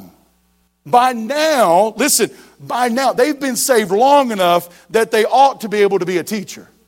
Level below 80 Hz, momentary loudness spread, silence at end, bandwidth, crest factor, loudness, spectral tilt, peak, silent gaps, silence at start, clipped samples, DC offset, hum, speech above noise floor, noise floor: -62 dBFS; 8 LU; 0.25 s; 16.5 kHz; 14 dB; -15 LUFS; -3 dB/octave; 0 dBFS; none; 0 s; under 0.1%; under 0.1%; none; 45 dB; -60 dBFS